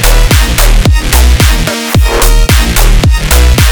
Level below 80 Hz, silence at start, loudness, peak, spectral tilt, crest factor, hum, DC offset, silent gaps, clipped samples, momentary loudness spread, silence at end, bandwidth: -6 dBFS; 0 s; -8 LUFS; 0 dBFS; -4 dB/octave; 6 dB; none; under 0.1%; none; 0.5%; 2 LU; 0 s; over 20 kHz